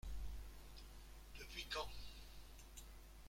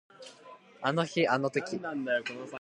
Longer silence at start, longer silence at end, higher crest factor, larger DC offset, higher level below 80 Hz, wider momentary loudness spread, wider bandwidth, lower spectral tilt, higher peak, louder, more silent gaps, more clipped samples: second, 0.05 s vs 0.2 s; about the same, 0 s vs 0 s; about the same, 18 dB vs 20 dB; neither; first, -56 dBFS vs -80 dBFS; second, 13 LU vs 21 LU; first, 16.5 kHz vs 11 kHz; second, -3 dB/octave vs -5.5 dB/octave; second, -34 dBFS vs -12 dBFS; second, -53 LUFS vs -31 LUFS; neither; neither